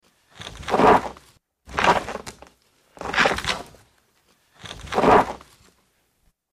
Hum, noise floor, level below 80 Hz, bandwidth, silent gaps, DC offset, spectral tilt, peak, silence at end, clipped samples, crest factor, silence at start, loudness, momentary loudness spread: none; -66 dBFS; -46 dBFS; 15.5 kHz; none; under 0.1%; -4 dB/octave; -6 dBFS; 1.15 s; under 0.1%; 18 dB; 0.4 s; -20 LUFS; 23 LU